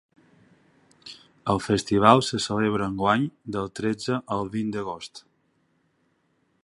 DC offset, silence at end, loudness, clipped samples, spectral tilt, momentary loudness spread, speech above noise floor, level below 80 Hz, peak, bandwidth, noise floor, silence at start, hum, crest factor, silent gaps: under 0.1%; 1.45 s; -24 LUFS; under 0.1%; -5.5 dB/octave; 22 LU; 45 dB; -54 dBFS; -2 dBFS; 11.5 kHz; -69 dBFS; 1.05 s; none; 26 dB; none